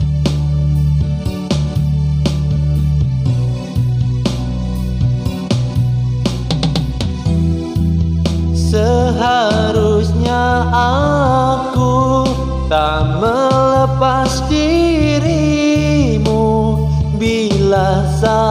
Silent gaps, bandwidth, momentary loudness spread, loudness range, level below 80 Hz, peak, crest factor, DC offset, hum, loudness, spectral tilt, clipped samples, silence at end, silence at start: none; 15.5 kHz; 5 LU; 4 LU; -24 dBFS; -2 dBFS; 12 dB; under 0.1%; none; -15 LUFS; -7 dB/octave; under 0.1%; 0 s; 0 s